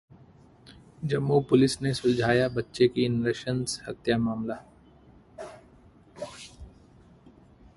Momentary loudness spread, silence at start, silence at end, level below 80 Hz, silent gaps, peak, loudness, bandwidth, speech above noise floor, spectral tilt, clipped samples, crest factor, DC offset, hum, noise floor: 21 LU; 0.7 s; 1.1 s; -56 dBFS; none; -8 dBFS; -26 LUFS; 11.5 kHz; 30 dB; -6 dB/octave; under 0.1%; 20 dB; under 0.1%; none; -55 dBFS